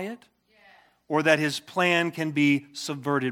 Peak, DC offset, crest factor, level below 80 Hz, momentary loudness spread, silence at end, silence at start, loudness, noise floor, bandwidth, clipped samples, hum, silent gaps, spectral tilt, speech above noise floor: -6 dBFS; under 0.1%; 22 dB; -78 dBFS; 11 LU; 0 s; 0 s; -24 LUFS; -57 dBFS; 16 kHz; under 0.1%; none; none; -5 dB/octave; 32 dB